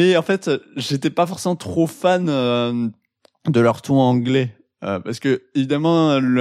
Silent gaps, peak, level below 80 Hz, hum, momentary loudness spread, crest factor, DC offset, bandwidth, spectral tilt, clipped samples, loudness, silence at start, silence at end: none; -4 dBFS; -62 dBFS; none; 9 LU; 16 dB; under 0.1%; 14.5 kHz; -6.5 dB/octave; under 0.1%; -19 LUFS; 0 s; 0 s